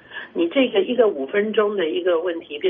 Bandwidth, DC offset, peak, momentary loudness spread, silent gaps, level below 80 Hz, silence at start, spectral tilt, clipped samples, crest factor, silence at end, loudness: 3.8 kHz; under 0.1%; -6 dBFS; 6 LU; none; -68 dBFS; 0.1 s; -2.5 dB/octave; under 0.1%; 16 dB; 0 s; -21 LUFS